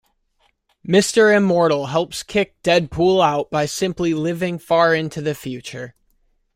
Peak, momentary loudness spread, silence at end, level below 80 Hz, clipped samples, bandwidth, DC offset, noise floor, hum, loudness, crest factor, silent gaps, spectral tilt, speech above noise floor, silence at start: -2 dBFS; 15 LU; 0.65 s; -50 dBFS; under 0.1%; 16.5 kHz; under 0.1%; -64 dBFS; none; -18 LUFS; 16 dB; none; -5 dB/octave; 46 dB; 0.85 s